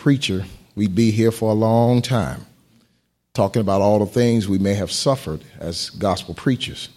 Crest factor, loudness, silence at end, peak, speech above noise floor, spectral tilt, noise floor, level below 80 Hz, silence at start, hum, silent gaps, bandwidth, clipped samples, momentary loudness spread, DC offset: 16 dB; -20 LUFS; 0.1 s; -4 dBFS; 47 dB; -6 dB/octave; -66 dBFS; -48 dBFS; 0 s; none; none; 15 kHz; under 0.1%; 11 LU; under 0.1%